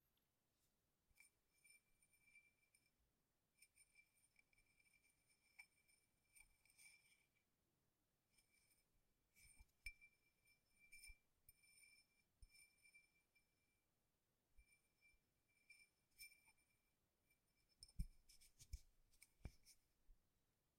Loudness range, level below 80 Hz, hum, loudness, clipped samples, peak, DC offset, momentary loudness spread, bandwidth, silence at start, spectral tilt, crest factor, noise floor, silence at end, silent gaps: 4 LU; -70 dBFS; none; -64 LUFS; under 0.1%; -34 dBFS; under 0.1%; 10 LU; 16 kHz; 0.05 s; -3 dB/octave; 34 dB; -90 dBFS; 0.3 s; none